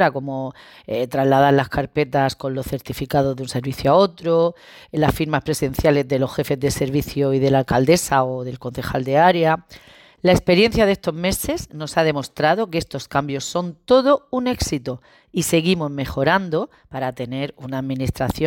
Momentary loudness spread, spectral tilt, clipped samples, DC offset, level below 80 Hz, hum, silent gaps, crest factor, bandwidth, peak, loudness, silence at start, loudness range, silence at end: 12 LU; -5.5 dB/octave; under 0.1%; under 0.1%; -40 dBFS; none; none; 16 dB; 17 kHz; -4 dBFS; -20 LUFS; 0 s; 3 LU; 0 s